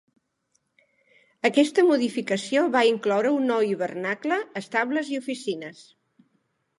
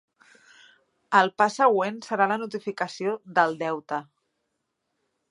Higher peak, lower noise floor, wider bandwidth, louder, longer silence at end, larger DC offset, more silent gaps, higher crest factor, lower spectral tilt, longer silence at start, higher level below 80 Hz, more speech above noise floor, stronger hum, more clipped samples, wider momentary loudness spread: about the same, -6 dBFS vs -4 dBFS; second, -73 dBFS vs -79 dBFS; about the same, 11.5 kHz vs 11 kHz; about the same, -24 LUFS vs -25 LUFS; second, 1.05 s vs 1.3 s; neither; neither; about the same, 20 dB vs 22 dB; about the same, -4.5 dB/octave vs -4.5 dB/octave; first, 1.45 s vs 1.1 s; about the same, -80 dBFS vs -80 dBFS; second, 49 dB vs 54 dB; neither; neither; about the same, 10 LU vs 11 LU